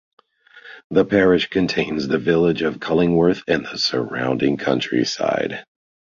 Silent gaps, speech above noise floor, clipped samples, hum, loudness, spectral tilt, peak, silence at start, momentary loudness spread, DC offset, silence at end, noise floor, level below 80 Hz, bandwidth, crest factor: 0.84-0.90 s; 29 dB; under 0.1%; none; -19 LUFS; -5.5 dB/octave; -2 dBFS; 0.55 s; 7 LU; under 0.1%; 0.55 s; -48 dBFS; -50 dBFS; 7.4 kHz; 18 dB